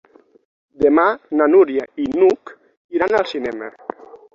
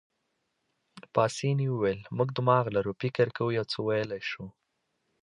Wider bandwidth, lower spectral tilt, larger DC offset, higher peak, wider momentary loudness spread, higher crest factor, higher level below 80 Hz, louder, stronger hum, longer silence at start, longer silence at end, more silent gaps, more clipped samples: second, 7.4 kHz vs 11 kHz; about the same, -6 dB/octave vs -6.5 dB/octave; neither; first, -2 dBFS vs -10 dBFS; first, 16 LU vs 9 LU; about the same, 16 dB vs 20 dB; first, -56 dBFS vs -64 dBFS; first, -17 LUFS vs -29 LUFS; neither; second, 0.8 s vs 0.95 s; second, 0.2 s vs 0.7 s; first, 2.77-2.89 s vs none; neither